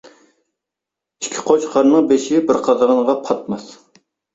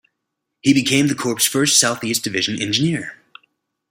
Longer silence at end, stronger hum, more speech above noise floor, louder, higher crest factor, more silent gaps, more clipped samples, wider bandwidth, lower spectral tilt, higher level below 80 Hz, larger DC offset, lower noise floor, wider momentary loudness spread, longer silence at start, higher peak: second, 0.6 s vs 0.75 s; neither; first, 69 dB vs 60 dB; about the same, -16 LUFS vs -17 LUFS; about the same, 18 dB vs 20 dB; neither; neither; second, 8 kHz vs 16.5 kHz; first, -4.5 dB/octave vs -3 dB/octave; about the same, -60 dBFS vs -60 dBFS; neither; first, -84 dBFS vs -78 dBFS; first, 13 LU vs 8 LU; first, 1.2 s vs 0.65 s; about the same, 0 dBFS vs 0 dBFS